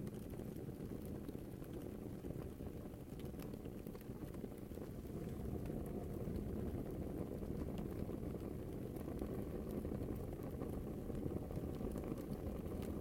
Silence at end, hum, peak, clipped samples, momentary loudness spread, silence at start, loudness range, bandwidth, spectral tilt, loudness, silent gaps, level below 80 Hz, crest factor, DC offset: 0 s; none; -28 dBFS; under 0.1%; 5 LU; 0 s; 4 LU; 16.5 kHz; -8 dB/octave; -47 LUFS; none; -54 dBFS; 18 dB; under 0.1%